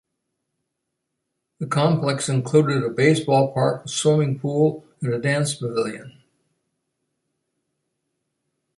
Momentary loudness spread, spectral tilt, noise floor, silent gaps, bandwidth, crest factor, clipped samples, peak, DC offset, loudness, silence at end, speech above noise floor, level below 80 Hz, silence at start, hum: 8 LU; -5.5 dB/octave; -79 dBFS; none; 11.5 kHz; 20 dB; under 0.1%; -4 dBFS; under 0.1%; -21 LUFS; 2.65 s; 59 dB; -64 dBFS; 1.6 s; none